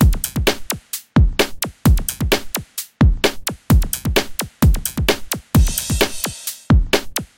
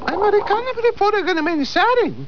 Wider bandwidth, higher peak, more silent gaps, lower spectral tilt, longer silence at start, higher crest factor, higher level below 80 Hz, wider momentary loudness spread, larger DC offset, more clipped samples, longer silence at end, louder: first, 17.5 kHz vs 5.4 kHz; first, 0 dBFS vs -6 dBFS; neither; about the same, -4.5 dB/octave vs -5 dB/octave; about the same, 0 s vs 0 s; about the same, 16 dB vs 12 dB; first, -22 dBFS vs -48 dBFS; first, 9 LU vs 4 LU; second, under 0.1% vs 2%; neither; first, 0.15 s vs 0 s; about the same, -19 LUFS vs -18 LUFS